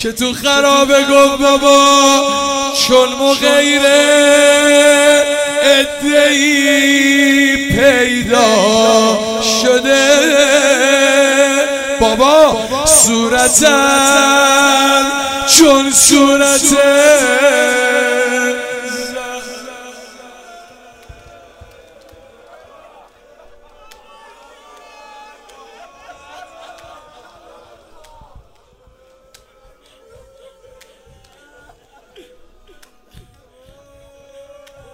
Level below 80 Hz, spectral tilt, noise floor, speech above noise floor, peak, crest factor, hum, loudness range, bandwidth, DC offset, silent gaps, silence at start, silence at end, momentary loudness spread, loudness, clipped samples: -42 dBFS; -1.5 dB/octave; -49 dBFS; 39 dB; 0 dBFS; 12 dB; none; 7 LU; 16.5 kHz; under 0.1%; none; 0 s; 8.2 s; 8 LU; -9 LUFS; under 0.1%